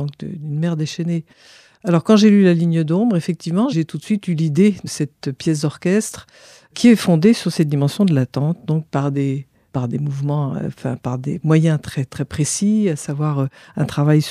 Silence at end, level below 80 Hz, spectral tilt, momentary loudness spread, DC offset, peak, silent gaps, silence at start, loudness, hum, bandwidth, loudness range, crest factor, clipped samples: 0 s; -56 dBFS; -6.5 dB/octave; 12 LU; under 0.1%; -2 dBFS; none; 0 s; -18 LUFS; none; 14 kHz; 4 LU; 16 dB; under 0.1%